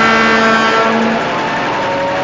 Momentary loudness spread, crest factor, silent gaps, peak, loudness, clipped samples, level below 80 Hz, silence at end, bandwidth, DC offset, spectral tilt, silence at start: 6 LU; 12 dB; none; 0 dBFS; -12 LUFS; under 0.1%; -44 dBFS; 0 s; 7.6 kHz; under 0.1%; -4 dB/octave; 0 s